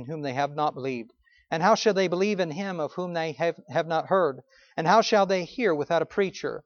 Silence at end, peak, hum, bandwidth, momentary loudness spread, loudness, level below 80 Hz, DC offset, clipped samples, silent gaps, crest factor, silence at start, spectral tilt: 0.05 s; -6 dBFS; none; 7 kHz; 10 LU; -26 LUFS; -70 dBFS; under 0.1%; under 0.1%; none; 20 dB; 0 s; -5 dB/octave